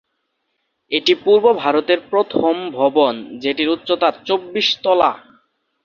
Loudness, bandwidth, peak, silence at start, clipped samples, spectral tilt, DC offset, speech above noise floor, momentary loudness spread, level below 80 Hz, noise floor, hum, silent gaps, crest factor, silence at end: -17 LUFS; 7.2 kHz; 0 dBFS; 0.9 s; under 0.1%; -4.5 dB/octave; under 0.1%; 55 dB; 8 LU; -60 dBFS; -71 dBFS; none; none; 18 dB; 0.65 s